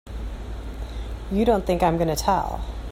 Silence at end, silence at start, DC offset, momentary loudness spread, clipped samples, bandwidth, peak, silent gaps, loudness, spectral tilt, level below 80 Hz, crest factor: 0 s; 0.05 s; under 0.1%; 14 LU; under 0.1%; 16 kHz; -6 dBFS; none; -23 LUFS; -6 dB/octave; -32 dBFS; 18 dB